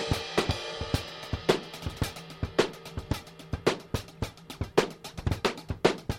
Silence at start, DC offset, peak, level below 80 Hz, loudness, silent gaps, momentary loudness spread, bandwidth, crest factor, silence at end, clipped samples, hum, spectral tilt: 0 s; under 0.1%; -6 dBFS; -44 dBFS; -32 LUFS; none; 10 LU; 16.5 kHz; 24 dB; 0 s; under 0.1%; none; -5 dB/octave